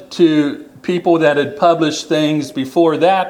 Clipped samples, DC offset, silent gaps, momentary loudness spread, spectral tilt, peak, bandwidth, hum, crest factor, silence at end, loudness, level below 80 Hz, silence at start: under 0.1%; under 0.1%; none; 7 LU; -5.5 dB/octave; 0 dBFS; 14 kHz; none; 14 dB; 0 s; -15 LUFS; -62 dBFS; 0 s